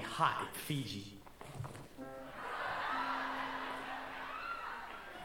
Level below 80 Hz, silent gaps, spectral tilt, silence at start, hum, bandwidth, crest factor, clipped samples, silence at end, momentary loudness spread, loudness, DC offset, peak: -64 dBFS; none; -4 dB/octave; 0 s; none; 19 kHz; 24 dB; under 0.1%; 0 s; 14 LU; -41 LUFS; under 0.1%; -18 dBFS